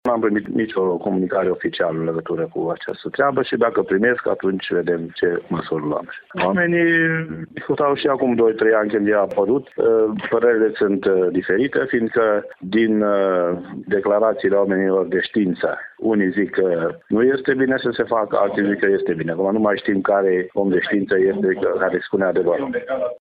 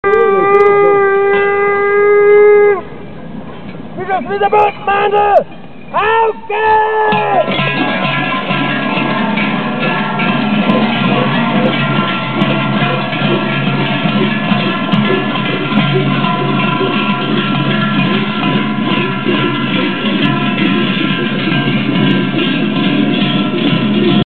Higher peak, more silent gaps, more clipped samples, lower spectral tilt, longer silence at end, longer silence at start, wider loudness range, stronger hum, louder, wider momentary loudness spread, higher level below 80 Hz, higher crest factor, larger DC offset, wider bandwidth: second, -4 dBFS vs 0 dBFS; neither; neither; about the same, -9.5 dB/octave vs -8.5 dB/octave; about the same, 0.05 s vs 0.05 s; about the same, 0.05 s vs 0.05 s; about the same, 3 LU vs 2 LU; neither; second, -19 LUFS vs -12 LUFS; about the same, 7 LU vs 6 LU; second, -58 dBFS vs -48 dBFS; about the same, 14 dB vs 12 dB; second, under 0.1% vs 3%; about the same, 4.9 kHz vs 4.6 kHz